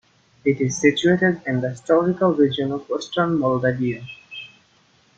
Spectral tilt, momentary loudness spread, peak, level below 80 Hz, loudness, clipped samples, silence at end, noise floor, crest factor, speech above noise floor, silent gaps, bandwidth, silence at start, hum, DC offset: -5.5 dB/octave; 14 LU; -2 dBFS; -60 dBFS; -20 LUFS; under 0.1%; 0.7 s; -58 dBFS; 18 dB; 38 dB; none; 9 kHz; 0.45 s; none; under 0.1%